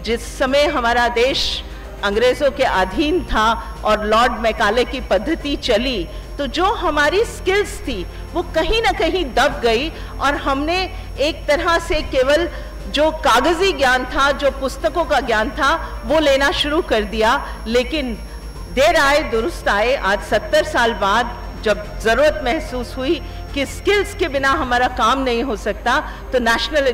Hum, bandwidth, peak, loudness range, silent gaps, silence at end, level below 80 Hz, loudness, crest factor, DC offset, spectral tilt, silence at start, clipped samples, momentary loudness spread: none; 16 kHz; -8 dBFS; 2 LU; none; 0 s; -30 dBFS; -18 LUFS; 10 dB; under 0.1%; -4 dB/octave; 0 s; under 0.1%; 8 LU